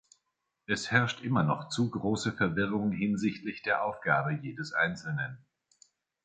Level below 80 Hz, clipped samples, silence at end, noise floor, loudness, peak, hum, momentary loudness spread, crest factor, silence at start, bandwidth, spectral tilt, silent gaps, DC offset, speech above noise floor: -62 dBFS; under 0.1%; 0.85 s; -82 dBFS; -31 LUFS; -10 dBFS; none; 8 LU; 22 dB; 0.7 s; 9.4 kHz; -5.5 dB/octave; none; under 0.1%; 52 dB